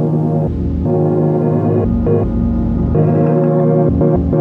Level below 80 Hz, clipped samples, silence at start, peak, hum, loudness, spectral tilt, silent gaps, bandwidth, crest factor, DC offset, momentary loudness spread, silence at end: -26 dBFS; under 0.1%; 0 s; -2 dBFS; none; -14 LUFS; -12.5 dB/octave; none; 3 kHz; 10 dB; under 0.1%; 4 LU; 0 s